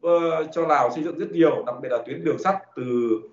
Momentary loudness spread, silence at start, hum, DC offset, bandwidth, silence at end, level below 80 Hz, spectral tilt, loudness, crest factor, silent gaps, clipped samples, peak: 7 LU; 0.05 s; none; under 0.1%; 7.6 kHz; 0.05 s; -74 dBFS; -5.5 dB/octave; -23 LUFS; 16 dB; none; under 0.1%; -6 dBFS